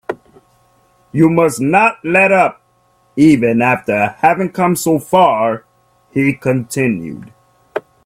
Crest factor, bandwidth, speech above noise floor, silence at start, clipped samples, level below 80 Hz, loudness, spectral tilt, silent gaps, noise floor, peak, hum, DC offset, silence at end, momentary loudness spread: 14 dB; 16 kHz; 43 dB; 0.1 s; under 0.1%; -54 dBFS; -13 LUFS; -6 dB/octave; none; -56 dBFS; 0 dBFS; none; under 0.1%; 0.25 s; 16 LU